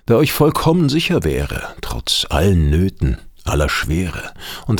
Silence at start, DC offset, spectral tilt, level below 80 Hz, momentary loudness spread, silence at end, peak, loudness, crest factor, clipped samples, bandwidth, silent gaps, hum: 0.1 s; under 0.1%; -5.5 dB/octave; -28 dBFS; 12 LU; 0 s; -2 dBFS; -17 LUFS; 16 dB; under 0.1%; 20 kHz; none; none